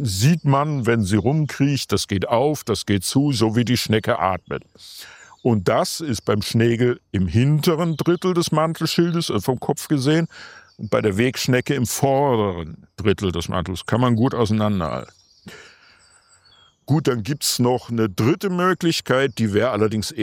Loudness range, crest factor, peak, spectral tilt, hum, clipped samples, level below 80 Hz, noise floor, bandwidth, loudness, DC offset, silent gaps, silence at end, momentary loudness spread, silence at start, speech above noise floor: 4 LU; 18 dB; -2 dBFS; -5.5 dB/octave; none; under 0.1%; -52 dBFS; -55 dBFS; 16 kHz; -20 LUFS; under 0.1%; none; 0 s; 7 LU; 0 s; 35 dB